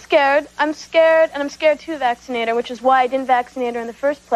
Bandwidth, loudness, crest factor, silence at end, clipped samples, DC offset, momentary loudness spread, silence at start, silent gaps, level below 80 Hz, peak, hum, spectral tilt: 12.5 kHz; -18 LUFS; 14 dB; 0 s; under 0.1%; under 0.1%; 8 LU; 0.1 s; none; -58 dBFS; -4 dBFS; none; -3 dB/octave